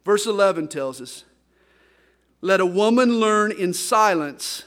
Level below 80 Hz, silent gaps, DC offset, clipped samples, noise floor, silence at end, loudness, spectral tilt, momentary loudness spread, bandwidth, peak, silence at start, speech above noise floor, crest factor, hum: -68 dBFS; none; under 0.1%; under 0.1%; -61 dBFS; 0.05 s; -20 LUFS; -4 dB/octave; 13 LU; 16.5 kHz; -4 dBFS; 0.05 s; 41 dB; 16 dB; none